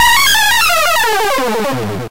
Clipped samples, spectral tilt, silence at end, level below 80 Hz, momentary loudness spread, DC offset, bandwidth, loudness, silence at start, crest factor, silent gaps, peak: under 0.1%; -1.5 dB/octave; 0 s; -36 dBFS; 9 LU; 7%; 16 kHz; -11 LUFS; 0 s; 10 dB; none; -2 dBFS